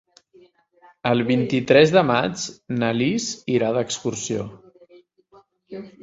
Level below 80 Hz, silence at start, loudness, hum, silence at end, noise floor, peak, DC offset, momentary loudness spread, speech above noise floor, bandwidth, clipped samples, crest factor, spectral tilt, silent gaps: -58 dBFS; 1.05 s; -21 LUFS; none; 0.15 s; -55 dBFS; -2 dBFS; under 0.1%; 15 LU; 35 dB; 8 kHz; under 0.1%; 20 dB; -5 dB/octave; none